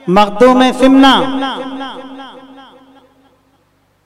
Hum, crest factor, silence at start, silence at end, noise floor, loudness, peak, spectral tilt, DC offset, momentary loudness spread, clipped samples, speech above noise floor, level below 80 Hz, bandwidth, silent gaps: 50 Hz at -60 dBFS; 12 dB; 0.05 s; 1.75 s; -56 dBFS; -10 LUFS; 0 dBFS; -5 dB/octave; under 0.1%; 22 LU; under 0.1%; 46 dB; -42 dBFS; 12 kHz; none